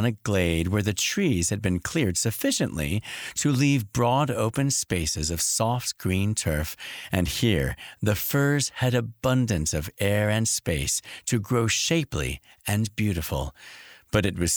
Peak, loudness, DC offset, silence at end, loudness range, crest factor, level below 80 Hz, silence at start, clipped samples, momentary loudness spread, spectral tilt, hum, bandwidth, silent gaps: -6 dBFS; -25 LUFS; under 0.1%; 0 s; 2 LU; 20 dB; -42 dBFS; 0 s; under 0.1%; 7 LU; -4.5 dB/octave; none; over 20 kHz; none